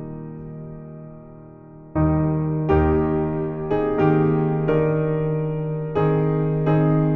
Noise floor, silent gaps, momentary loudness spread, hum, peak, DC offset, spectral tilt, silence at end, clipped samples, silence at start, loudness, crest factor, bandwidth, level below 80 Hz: -42 dBFS; none; 18 LU; none; -6 dBFS; under 0.1%; -9.5 dB/octave; 0 s; under 0.1%; 0 s; -21 LUFS; 16 dB; 3.8 kHz; -38 dBFS